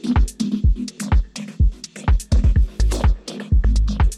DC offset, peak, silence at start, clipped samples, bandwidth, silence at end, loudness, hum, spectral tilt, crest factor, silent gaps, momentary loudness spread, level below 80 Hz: under 0.1%; -6 dBFS; 0.05 s; under 0.1%; 12 kHz; 0 s; -21 LUFS; none; -6 dB/octave; 10 dB; none; 5 LU; -18 dBFS